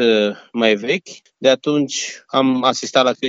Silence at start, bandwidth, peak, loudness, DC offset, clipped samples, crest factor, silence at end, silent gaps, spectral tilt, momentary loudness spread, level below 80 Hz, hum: 0 s; 8 kHz; 0 dBFS; -18 LUFS; under 0.1%; under 0.1%; 18 dB; 0 s; none; -3.5 dB/octave; 6 LU; -72 dBFS; none